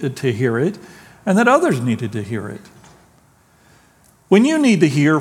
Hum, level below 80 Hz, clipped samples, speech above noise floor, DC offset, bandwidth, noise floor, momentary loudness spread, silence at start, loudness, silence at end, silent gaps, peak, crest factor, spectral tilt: none; -62 dBFS; under 0.1%; 37 dB; under 0.1%; 14.5 kHz; -53 dBFS; 14 LU; 0 s; -17 LUFS; 0 s; none; 0 dBFS; 18 dB; -6.5 dB/octave